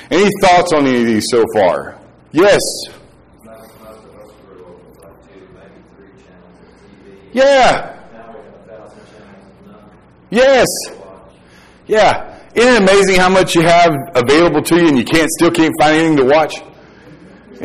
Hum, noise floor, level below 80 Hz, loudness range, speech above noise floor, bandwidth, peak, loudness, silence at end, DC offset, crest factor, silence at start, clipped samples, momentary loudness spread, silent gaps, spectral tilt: none; -43 dBFS; -40 dBFS; 8 LU; 33 dB; 15.5 kHz; -2 dBFS; -11 LUFS; 0 s; under 0.1%; 12 dB; 0 s; under 0.1%; 12 LU; none; -4.5 dB/octave